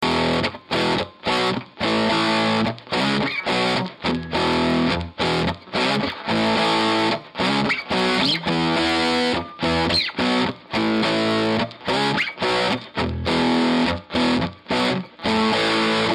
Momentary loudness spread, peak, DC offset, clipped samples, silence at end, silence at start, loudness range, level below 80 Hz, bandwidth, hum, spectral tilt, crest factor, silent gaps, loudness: 5 LU; -8 dBFS; under 0.1%; under 0.1%; 0 s; 0 s; 1 LU; -46 dBFS; 12.5 kHz; none; -5 dB/octave; 14 dB; none; -21 LUFS